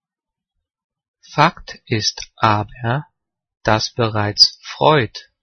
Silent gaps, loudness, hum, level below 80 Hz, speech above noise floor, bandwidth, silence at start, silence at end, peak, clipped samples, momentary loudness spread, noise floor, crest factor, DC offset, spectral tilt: none; -17 LUFS; none; -48 dBFS; 69 dB; 10.5 kHz; 1.3 s; 0.2 s; 0 dBFS; under 0.1%; 12 LU; -86 dBFS; 20 dB; under 0.1%; -4 dB/octave